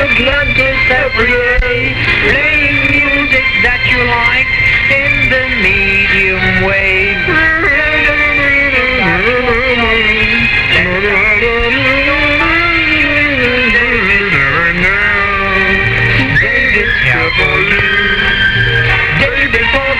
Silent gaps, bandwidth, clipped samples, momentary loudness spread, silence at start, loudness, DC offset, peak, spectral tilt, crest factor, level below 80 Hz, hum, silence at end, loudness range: none; 15 kHz; under 0.1%; 2 LU; 0 s; -9 LUFS; under 0.1%; 0 dBFS; -5.5 dB/octave; 10 dB; -24 dBFS; none; 0 s; 1 LU